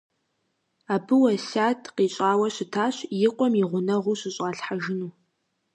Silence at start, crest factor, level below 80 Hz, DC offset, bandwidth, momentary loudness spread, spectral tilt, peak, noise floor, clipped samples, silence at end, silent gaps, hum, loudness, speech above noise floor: 0.9 s; 16 dB; -76 dBFS; under 0.1%; 10.5 kHz; 9 LU; -5.5 dB/octave; -10 dBFS; -75 dBFS; under 0.1%; 0.65 s; none; none; -25 LUFS; 51 dB